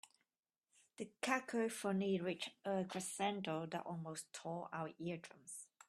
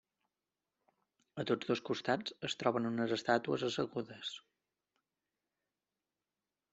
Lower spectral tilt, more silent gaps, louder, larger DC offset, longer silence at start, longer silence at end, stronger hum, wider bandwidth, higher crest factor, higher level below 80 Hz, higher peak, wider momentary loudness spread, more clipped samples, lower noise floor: about the same, -4.5 dB/octave vs -5 dB/octave; first, 0.39-0.43 s vs none; second, -43 LUFS vs -37 LUFS; neither; second, 0.05 s vs 1.35 s; second, 0.25 s vs 2.35 s; neither; first, 13.5 kHz vs 8.2 kHz; about the same, 22 dB vs 24 dB; second, -84 dBFS vs -78 dBFS; second, -20 dBFS vs -16 dBFS; about the same, 12 LU vs 11 LU; neither; about the same, under -90 dBFS vs under -90 dBFS